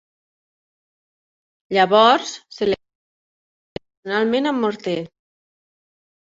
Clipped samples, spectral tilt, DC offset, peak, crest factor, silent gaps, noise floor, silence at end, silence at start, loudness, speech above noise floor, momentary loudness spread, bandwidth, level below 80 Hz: under 0.1%; -4.5 dB/octave; under 0.1%; -2 dBFS; 22 dB; 2.95-3.76 s, 3.97-4.03 s; under -90 dBFS; 1.3 s; 1.7 s; -19 LUFS; over 72 dB; 24 LU; 7.8 kHz; -62 dBFS